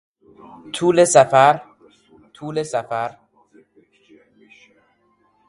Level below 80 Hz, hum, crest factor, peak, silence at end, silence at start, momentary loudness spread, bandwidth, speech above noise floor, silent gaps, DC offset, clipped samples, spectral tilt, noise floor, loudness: -66 dBFS; none; 20 dB; 0 dBFS; 2.4 s; 0.65 s; 17 LU; 11.5 kHz; 45 dB; none; under 0.1%; under 0.1%; -4 dB/octave; -62 dBFS; -17 LUFS